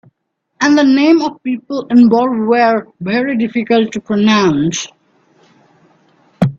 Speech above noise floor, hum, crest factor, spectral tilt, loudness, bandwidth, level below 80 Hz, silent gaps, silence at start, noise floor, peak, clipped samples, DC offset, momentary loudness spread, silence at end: 56 dB; none; 14 dB; -5.5 dB/octave; -13 LUFS; 7.8 kHz; -54 dBFS; none; 0.6 s; -68 dBFS; 0 dBFS; under 0.1%; under 0.1%; 10 LU; 0.05 s